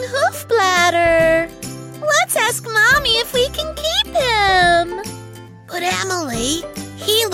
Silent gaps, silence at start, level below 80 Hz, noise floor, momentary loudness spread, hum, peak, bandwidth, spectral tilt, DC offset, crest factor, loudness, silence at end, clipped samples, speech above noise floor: none; 0 s; -40 dBFS; -36 dBFS; 14 LU; none; -4 dBFS; 16.5 kHz; -2 dB/octave; under 0.1%; 14 dB; -16 LUFS; 0 s; under 0.1%; 18 dB